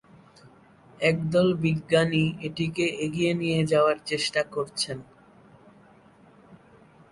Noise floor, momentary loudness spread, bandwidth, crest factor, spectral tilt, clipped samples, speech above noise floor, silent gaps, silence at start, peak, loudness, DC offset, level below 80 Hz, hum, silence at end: -55 dBFS; 8 LU; 11.5 kHz; 18 dB; -5.5 dB/octave; under 0.1%; 30 dB; none; 1 s; -8 dBFS; -25 LUFS; under 0.1%; -58 dBFS; none; 0.55 s